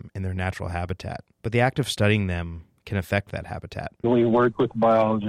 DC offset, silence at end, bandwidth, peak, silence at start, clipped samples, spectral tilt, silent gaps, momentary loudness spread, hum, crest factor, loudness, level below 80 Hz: under 0.1%; 0 s; 15 kHz; -8 dBFS; 0.05 s; under 0.1%; -6.5 dB/octave; none; 14 LU; none; 16 dB; -24 LUFS; -46 dBFS